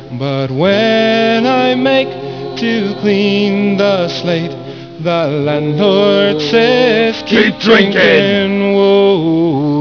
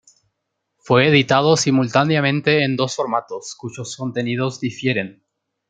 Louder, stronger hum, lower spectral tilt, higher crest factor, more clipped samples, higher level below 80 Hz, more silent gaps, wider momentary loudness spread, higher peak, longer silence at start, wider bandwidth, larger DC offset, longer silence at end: first, -11 LUFS vs -18 LUFS; neither; first, -6.5 dB/octave vs -5 dB/octave; second, 12 dB vs 18 dB; first, 0.1% vs under 0.1%; first, -50 dBFS vs -60 dBFS; neither; second, 9 LU vs 16 LU; about the same, 0 dBFS vs -2 dBFS; second, 0 s vs 0.85 s; second, 5.4 kHz vs 9.4 kHz; first, 0.3% vs under 0.1%; second, 0 s vs 0.6 s